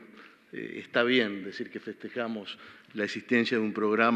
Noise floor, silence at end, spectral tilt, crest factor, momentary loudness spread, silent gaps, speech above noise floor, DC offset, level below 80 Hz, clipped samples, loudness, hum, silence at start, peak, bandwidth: -53 dBFS; 0 s; -5.5 dB/octave; 22 dB; 17 LU; none; 24 dB; under 0.1%; -84 dBFS; under 0.1%; -30 LUFS; none; 0 s; -8 dBFS; 8.8 kHz